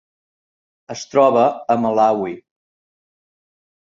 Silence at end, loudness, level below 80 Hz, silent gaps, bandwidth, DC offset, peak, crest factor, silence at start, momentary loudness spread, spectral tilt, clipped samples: 1.6 s; -16 LUFS; -66 dBFS; none; 7.8 kHz; under 0.1%; -2 dBFS; 18 dB; 0.9 s; 18 LU; -5.5 dB/octave; under 0.1%